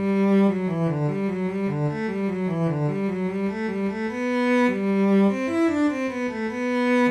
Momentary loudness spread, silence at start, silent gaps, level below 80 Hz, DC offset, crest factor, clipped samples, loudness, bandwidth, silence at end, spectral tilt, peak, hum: 7 LU; 0 s; none; -60 dBFS; under 0.1%; 12 dB; under 0.1%; -23 LUFS; 9.6 kHz; 0 s; -8 dB/octave; -10 dBFS; none